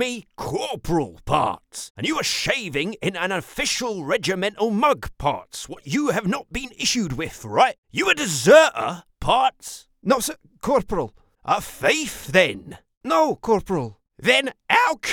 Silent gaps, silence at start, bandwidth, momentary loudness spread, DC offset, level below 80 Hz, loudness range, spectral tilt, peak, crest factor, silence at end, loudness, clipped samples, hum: 1.90-1.95 s, 7.78-7.83 s, 12.97-13.01 s; 0 s; 19.5 kHz; 12 LU; under 0.1%; -46 dBFS; 5 LU; -3.5 dB/octave; 0 dBFS; 22 dB; 0 s; -21 LUFS; under 0.1%; none